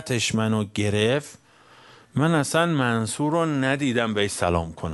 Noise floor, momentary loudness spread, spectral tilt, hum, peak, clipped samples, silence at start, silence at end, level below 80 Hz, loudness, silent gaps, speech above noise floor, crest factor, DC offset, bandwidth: -52 dBFS; 4 LU; -5 dB/octave; none; -6 dBFS; under 0.1%; 0 s; 0 s; -50 dBFS; -23 LUFS; none; 29 dB; 18 dB; under 0.1%; 11.5 kHz